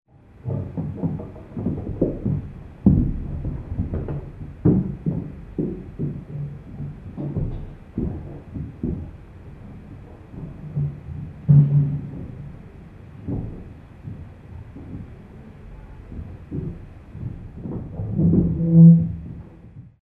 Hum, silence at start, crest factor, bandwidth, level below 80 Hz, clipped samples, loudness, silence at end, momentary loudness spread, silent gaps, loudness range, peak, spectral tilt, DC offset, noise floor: none; 0.45 s; 22 dB; 2.7 kHz; -38 dBFS; under 0.1%; -22 LUFS; 0.15 s; 23 LU; none; 18 LU; -2 dBFS; -12.5 dB/octave; under 0.1%; -43 dBFS